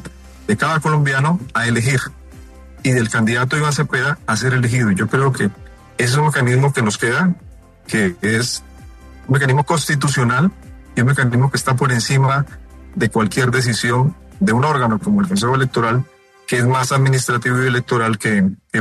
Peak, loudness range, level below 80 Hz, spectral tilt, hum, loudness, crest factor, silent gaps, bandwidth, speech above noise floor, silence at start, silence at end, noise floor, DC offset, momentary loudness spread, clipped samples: -2 dBFS; 2 LU; -44 dBFS; -5.5 dB/octave; none; -17 LUFS; 14 dB; none; 13 kHz; 23 dB; 0 s; 0 s; -38 dBFS; under 0.1%; 6 LU; under 0.1%